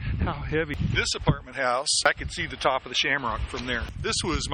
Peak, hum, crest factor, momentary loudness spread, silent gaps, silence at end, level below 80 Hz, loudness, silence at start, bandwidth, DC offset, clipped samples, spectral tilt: -6 dBFS; none; 22 dB; 7 LU; none; 0 s; -38 dBFS; -26 LUFS; 0 s; 10.5 kHz; under 0.1%; under 0.1%; -3.5 dB/octave